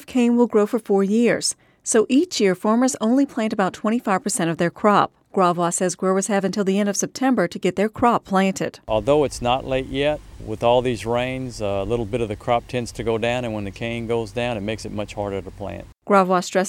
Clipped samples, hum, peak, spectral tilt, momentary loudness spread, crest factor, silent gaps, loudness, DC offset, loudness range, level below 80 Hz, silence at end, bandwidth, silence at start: under 0.1%; none; -2 dBFS; -5 dB/octave; 10 LU; 18 dB; none; -21 LUFS; under 0.1%; 5 LU; -46 dBFS; 0 s; 15.5 kHz; 0 s